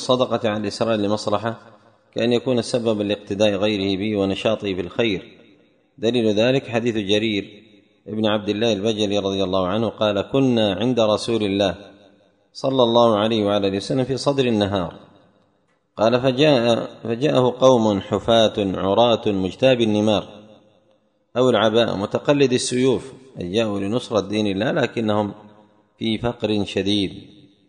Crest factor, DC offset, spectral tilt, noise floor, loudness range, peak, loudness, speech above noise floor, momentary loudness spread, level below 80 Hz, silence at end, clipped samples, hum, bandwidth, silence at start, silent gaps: 20 dB; under 0.1%; -5.5 dB/octave; -65 dBFS; 4 LU; -2 dBFS; -20 LUFS; 45 dB; 8 LU; -54 dBFS; 0.45 s; under 0.1%; none; 10.5 kHz; 0 s; none